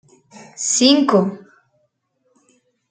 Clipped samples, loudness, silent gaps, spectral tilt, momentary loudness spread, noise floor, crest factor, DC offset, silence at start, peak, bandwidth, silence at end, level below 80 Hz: under 0.1%; -15 LUFS; none; -3.5 dB/octave; 13 LU; -67 dBFS; 18 dB; under 0.1%; 0.4 s; -2 dBFS; 9.6 kHz; 1.55 s; -68 dBFS